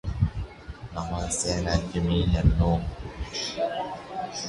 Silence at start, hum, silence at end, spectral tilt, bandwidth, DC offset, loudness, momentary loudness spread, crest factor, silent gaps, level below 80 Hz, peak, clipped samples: 0.05 s; none; 0 s; -5 dB/octave; 11.5 kHz; under 0.1%; -27 LUFS; 15 LU; 18 dB; none; -32 dBFS; -8 dBFS; under 0.1%